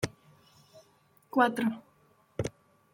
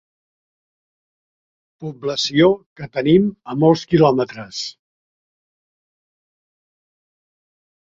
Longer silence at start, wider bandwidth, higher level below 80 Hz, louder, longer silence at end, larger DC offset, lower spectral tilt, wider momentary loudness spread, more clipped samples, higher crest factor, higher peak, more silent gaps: second, 0 s vs 1.8 s; first, 16.5 kHz vs 7.8 kHz; second, -64 dBFS vs -56 dBFS; second, -31 LUFS vs -18 LUFS; second, 0.45 s vs 3.15 s; neither; about the same, -5.5 dB/octave vs -6 dB/octave; about the same, 15 LU vs 13 LU; neither; about the same, 24 dB vs 20 dB; second, -10 dBFS vs -2 dBFS; second, none vs 2.66-2.76 s